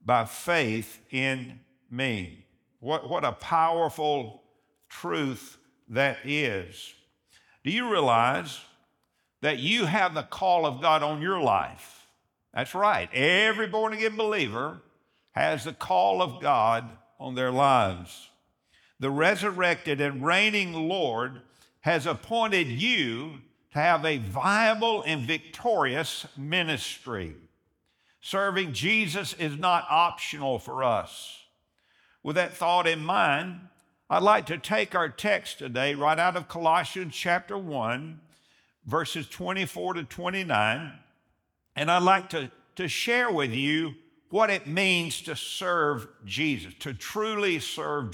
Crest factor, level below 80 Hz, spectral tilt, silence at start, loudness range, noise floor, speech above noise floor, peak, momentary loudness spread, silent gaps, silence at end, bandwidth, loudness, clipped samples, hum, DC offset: 20 dB; -68 dBFS; -4.5 dB/octave; 0.05 s; 4 LU; -75 dBFS; 48 dB; -8 dBFS; 13 LU; none; 0 s; over 20 kHz; -26 LUFS; under 0.1%; none; under 0.1%